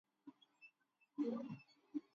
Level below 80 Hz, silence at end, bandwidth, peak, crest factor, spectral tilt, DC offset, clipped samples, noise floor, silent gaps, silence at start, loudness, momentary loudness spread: under -90 dBFS; 0.15 s; 7 kHz; -32 dBFS; 18 dB; -7 dB/octave; under 0.1%; under 0.1%; -79 dBFS; none; 0.25 s; -48 LUFS; 21 LU